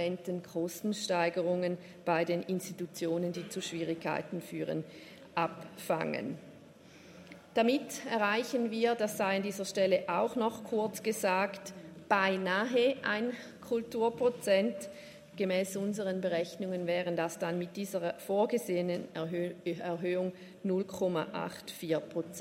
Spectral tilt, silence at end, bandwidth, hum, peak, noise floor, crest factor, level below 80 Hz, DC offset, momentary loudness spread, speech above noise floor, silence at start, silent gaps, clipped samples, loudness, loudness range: -5 dB/octave; 0 s; 16 kHz; none; -12 dBFS; -55 dBFS; 20 dB; -78 dBFS; under 0.1%; 10 LU; 22 dB; 0 s; none; under 0.1%; -33 LUFS; 5 LU